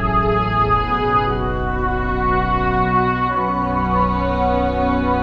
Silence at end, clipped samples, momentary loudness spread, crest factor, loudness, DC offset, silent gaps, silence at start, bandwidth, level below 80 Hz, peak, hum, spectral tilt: 0 s; under 0.1%; 4 LU; 14 dB; -18 LUFS; under 0.1%; none; 0 s; 6.2 kHz; -26 dBFS; -4 dBFS; none; -8.5 dB/octave